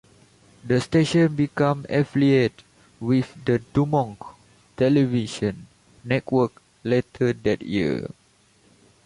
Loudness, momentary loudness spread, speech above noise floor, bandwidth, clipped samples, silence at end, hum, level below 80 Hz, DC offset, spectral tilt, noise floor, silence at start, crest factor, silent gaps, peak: -23 LUFS; 13 LU; 37 dB; 11.5 kHz; under 0.1%; 1 s; none; -54 dBFS; under 0.1%; -7 dB/octave; -59 dBFS; 0.65 s; 16 dB; none; -8 dBFS